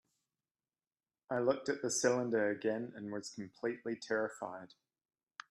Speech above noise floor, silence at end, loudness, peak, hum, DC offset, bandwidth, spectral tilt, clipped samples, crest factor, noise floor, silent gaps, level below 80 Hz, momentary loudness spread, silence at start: over 53 dB; 0.85 s; -37 LUFS; -16 dBFS; none; under 0.1%; 13.5 kHz; -4 dB/octave; under 0.1%; 22 dB; under -90 dBFS; none; -84 dBFS; 14 LU; 1.3 s